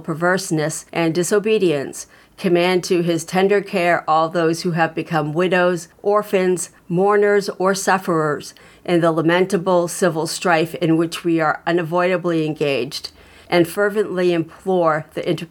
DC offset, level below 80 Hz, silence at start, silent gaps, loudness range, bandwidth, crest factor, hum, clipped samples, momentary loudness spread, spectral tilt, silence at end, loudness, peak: under 0.1%; -60 dBFS; 0 s; none; 2 LU; 18 kHz; 16 dB; none; under 0.1%; 7 LU; -5 dB/octave; 0.05 s; -18 LUFS; -2 dBFS